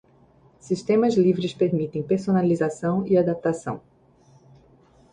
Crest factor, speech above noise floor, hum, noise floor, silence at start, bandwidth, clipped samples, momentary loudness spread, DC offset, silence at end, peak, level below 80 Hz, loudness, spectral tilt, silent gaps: 16 dB; 34 dB; none; -56 dBFS; 0.65 s; 10 kHz; under 0.1%; 9 LU; under 0.1%; 1.35 s; -8 dBFS; -60 dBFS; -23 LUFS; -7.5 dB/octave; none